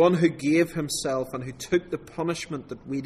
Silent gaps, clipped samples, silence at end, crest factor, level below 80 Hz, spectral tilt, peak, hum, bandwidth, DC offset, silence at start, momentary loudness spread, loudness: none; under 0.1%; 0 s; 18 dB; -56 dBFS; -5.5 dB/octave; -8 dBFS; none; 14.5 kHz; under 0.1%; 0 s; 12 LU; -27 LUFS